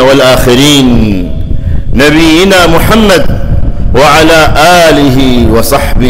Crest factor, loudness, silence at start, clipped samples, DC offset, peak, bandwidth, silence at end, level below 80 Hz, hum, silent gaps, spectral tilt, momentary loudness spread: 4 dB; -5 LUFS; 0 s; 0.4%; under 0.1%; 0 dBFS; 16.5 kHz; 0 s; -12 dBFS; none; none; -5 dB/octave; 10 LU